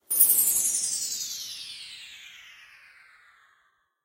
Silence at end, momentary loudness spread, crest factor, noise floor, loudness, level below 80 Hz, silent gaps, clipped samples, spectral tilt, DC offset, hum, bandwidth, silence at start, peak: 1.4 s; 25 LU; 26 dB; -69 dBFS; -22 LUFS; -72 dBFS; none; under 0.1%; 2.5 dB/octave; under 0.1%; none; 16 kHz; 0.1 s; -4 dBFS